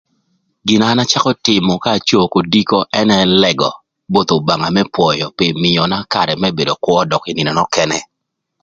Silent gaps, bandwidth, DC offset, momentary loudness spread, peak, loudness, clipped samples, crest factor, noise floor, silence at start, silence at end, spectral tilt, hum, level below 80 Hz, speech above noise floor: none; 7.8 kHz; under 0.1%; 5 LU; 0 dBFS; -14 LUFS; under 0.1%; 14 dB; -75 dBFS; 0.65 s; 0.6 s; -4.5 dB/octave; none; -48 dBFS; 61 dB